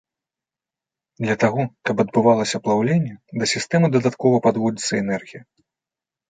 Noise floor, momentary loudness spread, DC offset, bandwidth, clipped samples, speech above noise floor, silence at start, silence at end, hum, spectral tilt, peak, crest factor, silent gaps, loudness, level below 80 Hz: -89 dBFS; 7 LU; under 0.1%; 9.6 kHz; under 0.1%; 69 dB; 1.2 s; 0.9 s; none; -5.5 dB/octave; -4 dBFS; 18 dB; none; -20 LUFS; -62 dBFS